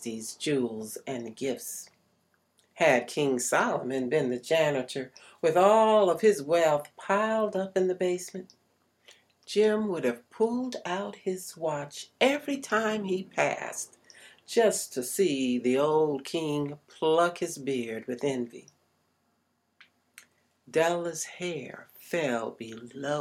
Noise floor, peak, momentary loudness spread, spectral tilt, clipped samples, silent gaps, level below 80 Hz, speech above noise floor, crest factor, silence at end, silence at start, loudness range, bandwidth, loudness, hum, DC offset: -74 dBFS; -8 dBFS; 13 LU; -4 dB/octave; under 0.1%; none; -76 dBFS; 46 dB; 22 dB; 0 s; 0 s; 9 LU; 16.5 kHz; -28 LUFS; none; under 0.1%